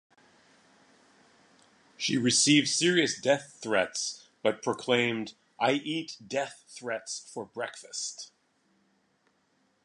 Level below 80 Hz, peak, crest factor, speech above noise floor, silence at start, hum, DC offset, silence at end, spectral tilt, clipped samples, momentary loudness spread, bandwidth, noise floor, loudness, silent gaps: -76 dBFS; -8 dBFS; 22 dB; 42 dB; 2 s; none; under 0.1%; 1.6 s; -3 dB/octave; under 0.1%; 15 LU; 11.5 kHz; -71 dBFS; -28 LUFS; none